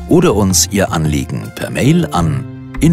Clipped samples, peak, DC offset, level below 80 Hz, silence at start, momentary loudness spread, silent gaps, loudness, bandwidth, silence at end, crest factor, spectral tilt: under 0.1%; 0 dBFS; under 0.1%; -30 dBFS; 0 s; 11 LU; none; -14 LUFS; 16 kHz; 0 s; 14 dB; -5 dB/octave